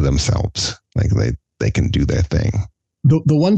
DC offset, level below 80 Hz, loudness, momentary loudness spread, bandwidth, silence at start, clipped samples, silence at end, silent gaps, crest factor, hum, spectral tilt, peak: under 0.1%; -28 dBFS; -18 LUFS; 7 LU; 8.8 kHz; 0 s; under 0.1%; 0 s; none; 12 dB; none; -6 dB/octave; -4 dBFS